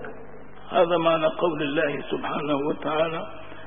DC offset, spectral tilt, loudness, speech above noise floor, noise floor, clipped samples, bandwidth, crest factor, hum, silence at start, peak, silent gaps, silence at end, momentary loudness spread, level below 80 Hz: 1%; -10 dB/octave; -25 LUFS; 20 dB; -44 dBFS; under 0.1%; 3.7 kHz; 18 dB; 50 Hz at -55 dBFS; 0 s; -8 dBFS; none; 0 s; 19 LU; -58 dBFS